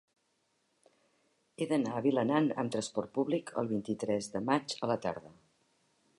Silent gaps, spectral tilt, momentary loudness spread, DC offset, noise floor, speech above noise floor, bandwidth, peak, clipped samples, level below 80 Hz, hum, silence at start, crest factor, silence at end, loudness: none; -5.5 dB/octave; 6 LU; under 0.1%; -77 dBFS; 44 dB; 11.5 kHz; -14 dBFS; under 0.1%; -74 dBFS; none; 1.6 s; 20 dB; 0.9 s; -33 LUFS